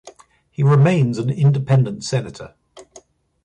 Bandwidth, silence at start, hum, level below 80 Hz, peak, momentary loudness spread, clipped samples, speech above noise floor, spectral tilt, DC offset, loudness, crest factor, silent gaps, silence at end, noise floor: 9.4 kHz; 0.05 s; none; -56 dBFS; -4 dBFS; 21 LU; under 0.1%; 32 dB; -7.5 dB/octave; under 0.1%; -17 LUFS; 14 dB; none; 0.65 s; -49 dBFS